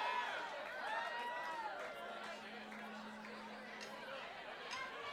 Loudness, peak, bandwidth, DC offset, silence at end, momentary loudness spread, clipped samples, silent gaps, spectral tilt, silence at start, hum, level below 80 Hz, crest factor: -46 LUFS; -30 dBFS; 17 kHz; under 0.1%; 0 s; 8 LU; under 0.1%; none; -2.5 dB/octave; 0 s; none; -82 dBFS; 16 dB